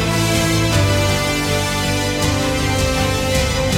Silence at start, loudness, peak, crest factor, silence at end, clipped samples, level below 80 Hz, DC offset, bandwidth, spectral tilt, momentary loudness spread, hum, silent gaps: 0 s; -17 LUFS; -4 dBFS; 14 dB; 0 s; under 0.1%; -28 dBFS; under 0.1%; 17 kHz; -4 dB/octave; 2 LU; none; none